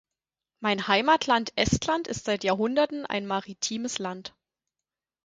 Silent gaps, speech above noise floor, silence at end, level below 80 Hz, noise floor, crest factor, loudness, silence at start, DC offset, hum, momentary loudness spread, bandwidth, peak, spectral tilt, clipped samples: none; 63 dB; 0.95 s; -52 dBFS; -90 dBFS; 22 dB; -26 LUFS; 0.6 s; under 0.1%; none; 10 LU; 9.6 kHz; -6 dBFS; -3.5 dB/octave; under 0.1%